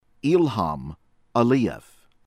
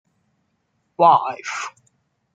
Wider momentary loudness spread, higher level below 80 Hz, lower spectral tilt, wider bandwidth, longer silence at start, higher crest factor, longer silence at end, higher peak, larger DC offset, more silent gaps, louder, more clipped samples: about the same, 16 LU vs 15 LU; first, -50 dBFS vs -76 dBFS; first, -7.5 dB/octave vs -4 dB/octave; first, 13.5 kHz vs 9.2 kHz; second, 0.25 s vs 1 s; about the same, 18 dB vs 20 dB; second, 0.45 s vs 0.65 s; second, -6 dBFS vs -2 dBFS; neither; neither; second, -23 LUFS vs -18 LUFS; neither